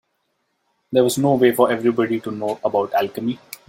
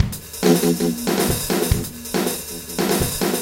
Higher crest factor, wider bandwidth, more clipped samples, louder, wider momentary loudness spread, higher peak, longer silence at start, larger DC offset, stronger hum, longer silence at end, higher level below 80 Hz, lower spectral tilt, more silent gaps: about the same, 18 dB vs 20 dB; about the same, 16.5 kHz vs 17 kHz; neither; about the same, -19 LUFS vs -20 LUFS; about the same, 9 LU vs 7 LU; about the same, -2 dBFS vs -2 dBFS; first, 0.9 s vs 0 s; neither; neither; first, 0.15 s vs 0 s; second, -64 dBFS vs -34 dBFS; about the same, -5.5 dB/octave vs -4.5 dB/octave; neither